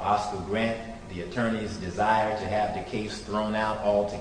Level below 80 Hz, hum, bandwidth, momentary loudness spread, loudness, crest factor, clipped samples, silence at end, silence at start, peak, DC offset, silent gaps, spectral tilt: -48 dBFS; none; 10.5 kHz; 9 LU; -28 LUFS; 16 dB; under 0.1%; 0 s; 0 s; -10 dBFS; under 0.1%; none; -5.5 dB/octave